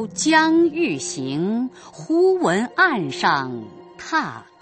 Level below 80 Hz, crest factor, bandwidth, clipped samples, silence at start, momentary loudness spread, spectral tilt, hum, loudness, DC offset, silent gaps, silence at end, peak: -64 dBFS; 18 dB; 8.8 kHz; under 0.1%; 0 s; 15 LU; -4 dB/octave; none; -20 LUFS; under 0.1%; none; 0.2 s; -2 dBFS